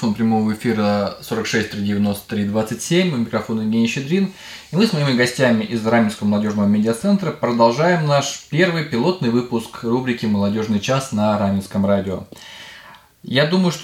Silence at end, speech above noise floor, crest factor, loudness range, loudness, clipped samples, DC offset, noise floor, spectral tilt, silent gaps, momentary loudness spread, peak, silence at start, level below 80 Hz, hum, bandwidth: 0 s; 25 dB; 16 dB; 3 LU; -19 LUFS; under 0.1%; under 0.1%; -44 dBFS; -5.5 dB/octave; none; 8 LU; -2 dBFS; 0 s; -56 dBFS; none; 16 kHz